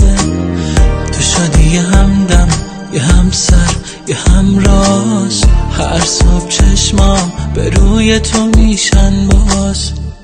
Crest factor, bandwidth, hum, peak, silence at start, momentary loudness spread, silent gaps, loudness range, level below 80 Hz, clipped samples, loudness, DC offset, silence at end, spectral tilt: 8 dB; 9.8 kHz; none; 0 dBFS; 0 s; 6 LU; none; 1 LU; -12 dBFS; 0.1%; -11 LUFS; under 0.1%; 0.05 s; -4.5 dB/octave